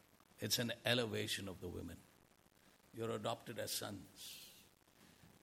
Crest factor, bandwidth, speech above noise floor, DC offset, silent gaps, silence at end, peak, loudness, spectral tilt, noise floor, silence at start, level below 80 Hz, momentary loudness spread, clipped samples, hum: 26 dB; 16.5 kHz; 27 dB; under 0.1%; none; 0.15 s; -20 dBFS; -42 LUFS; -3.5 dB/octave; -70 dBFS; 0.35 s; -76 dBFS; 17 LU; under 0.1%; none